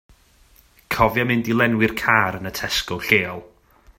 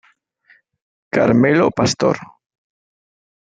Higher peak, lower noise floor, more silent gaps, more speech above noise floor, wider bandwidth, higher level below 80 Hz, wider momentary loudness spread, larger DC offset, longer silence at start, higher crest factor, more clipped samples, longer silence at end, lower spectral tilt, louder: about the same, 0 dBFS vs -2 dBFS; about the same, -54 dBFS vs -55 dBFS; neither; second, 34 dB vs 41 dB; first, 16.5 kHz vs 9.2 kHz; first, -44 dBFS vs -56 dBFS; about the same, 10 LU vs 9 LU; neither; second, 0.9 s vs 1.15 s; about the same, 22 dB vs 18 dB; neither; second, 0.55 s vs 1.2 s; about the same, -4.5 dB/octave vs -5.5 dB/octave; second, -20 LUFS vs -16 LUFS